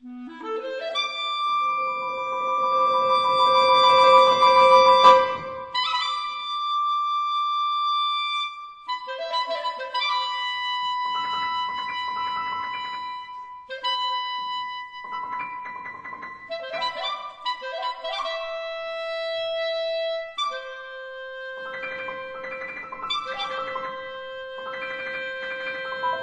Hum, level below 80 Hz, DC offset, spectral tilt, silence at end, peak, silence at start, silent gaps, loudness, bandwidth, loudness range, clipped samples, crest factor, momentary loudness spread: none; -66 dBFS; under 0.1%; -2 dB/octave; 0 s; -2 dBFS; 0 s; none; -23 LUFS; 8.8 kHz; 14 LU; under 0.1%; 22 dB; 19 LU